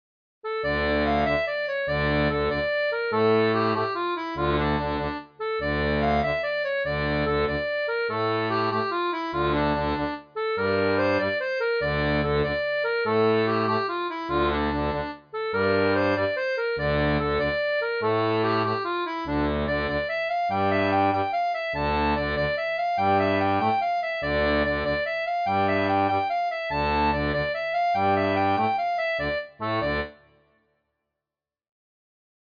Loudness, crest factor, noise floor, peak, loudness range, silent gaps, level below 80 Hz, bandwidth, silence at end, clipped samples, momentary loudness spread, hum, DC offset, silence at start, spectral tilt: -25 LUFS; 14 dB; -90 dBFS; -10 dBFS; 2 LU; none; -42 dBFS; 5.2 kHz; 2.3 s; under 0.1%; 5 LU; none; under 0.1%; 0.45 s; -7.5 dB/octave